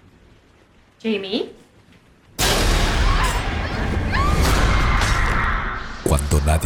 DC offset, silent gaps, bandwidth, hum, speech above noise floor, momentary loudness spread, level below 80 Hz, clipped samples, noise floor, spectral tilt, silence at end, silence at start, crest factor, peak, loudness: under 0.1%; none; 19 kHz; none; 32 dB; 8 LU; -24 dBFS; under 0.1%; -53 dBFS; -4.5 dB/octave; 0 s; 1.05 s; 16 dB; -4 dBFS; -20 LUFS